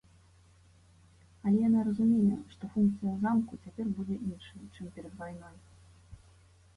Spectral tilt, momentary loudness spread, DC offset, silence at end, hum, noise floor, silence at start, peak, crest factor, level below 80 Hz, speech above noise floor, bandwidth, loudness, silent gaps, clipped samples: -9 dB/octave; 20 LU; under 0.1%; 0.6 s; none; -61 dBFS; 1.45 s; -18 dBFS; 16 dB; -60 dBFS; 30 dB; 11 kHz; -30 LUFS; none; under 0.1%